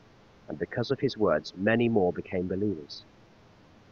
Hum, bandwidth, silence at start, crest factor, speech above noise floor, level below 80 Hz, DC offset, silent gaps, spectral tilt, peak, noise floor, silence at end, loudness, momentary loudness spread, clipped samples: none; 7.2 kHz; 0.5 s; 20 dB; 28 dB; -60 dBFS; under 0.1%; none; -7 dB/octave; -10 dBFS; -57 dBFS; 0.9 s; -29 LUFS; 15 LU; under 0.1%